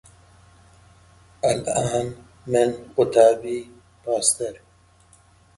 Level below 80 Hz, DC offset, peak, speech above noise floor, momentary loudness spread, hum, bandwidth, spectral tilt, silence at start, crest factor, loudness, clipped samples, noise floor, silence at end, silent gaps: -56 dBFS; under 0.1%; -2 dBFS; 34 dB; 16 LU; none; 11.5 kHz; -4 dB/octave; 1.45 s; 22 dB; -22 LUFS; under 0.1%; -55 dBFS; 1 s; none